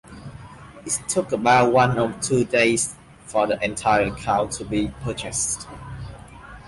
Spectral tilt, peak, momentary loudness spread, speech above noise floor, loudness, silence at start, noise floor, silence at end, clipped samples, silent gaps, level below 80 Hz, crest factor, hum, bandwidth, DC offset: -4 dB/octave; -6 dBFS; 22 LU; 21 dB; -21 LUFS; 0.1 s; -42 dBFS; 0 s; under 0.1%; none; -46 dBFS; 18 dB; none; 12 kHz; under 0.1%